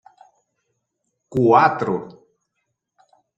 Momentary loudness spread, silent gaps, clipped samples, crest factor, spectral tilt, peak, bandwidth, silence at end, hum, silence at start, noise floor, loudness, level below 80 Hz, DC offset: 13 LU; none; under 0.1%; 20 dB; -8 dB/octave; -2 dBFS; 8 kHz; 1.25 s; none; 1.3 s; -76 dBFS; -18 LUFS; -62 dBFS; under 0.1%